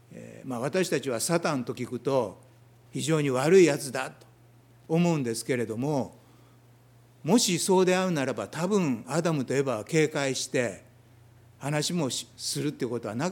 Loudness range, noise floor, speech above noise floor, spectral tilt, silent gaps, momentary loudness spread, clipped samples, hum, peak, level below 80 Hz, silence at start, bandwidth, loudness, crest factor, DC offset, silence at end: 4 LU; -57 dBFS; 30 dB; -5 dB/octave; none; 12 LU; under 0.1%; none; -8 dBFS; -72 dBFS; 0.1 s; 18 kHz; -27 LUFS; 20 dB; under 0.1%; 0 s